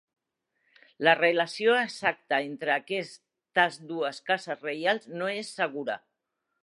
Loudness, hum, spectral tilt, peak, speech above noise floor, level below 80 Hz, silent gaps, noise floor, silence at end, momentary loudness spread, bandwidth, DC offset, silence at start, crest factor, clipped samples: -28 LUFS; none; -4 dB/octave; -6 dBFS; 54 dB; -82 dBFS; none; -82 dBFS; 0.7 s; 10 LU; 11.5 kHz; under 0.1%; 1 s; 24 dB; under 0.1%